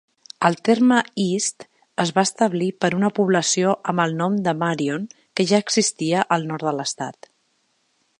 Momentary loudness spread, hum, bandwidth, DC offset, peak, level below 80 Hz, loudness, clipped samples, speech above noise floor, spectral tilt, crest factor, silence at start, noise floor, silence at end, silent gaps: 8 LU; none; 11 kHz; under 0.1%; -2 dBFS; -70 dBFS; -21 LUFS; under 0.1%; 47 dB; -4 dB/octave; 20 dB; 0.4 s; -67 dBFS; 1.05 s; none